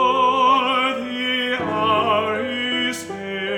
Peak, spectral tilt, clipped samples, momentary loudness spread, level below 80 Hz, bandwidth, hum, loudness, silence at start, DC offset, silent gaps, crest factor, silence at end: -6 dBFS; -3.5 dB/octave; under 0.1%; 8 LU; -62 dBFS; 18 kHz; none; -19 LUFS; 0 s; under 0.1%; none; 14 dB; 0 s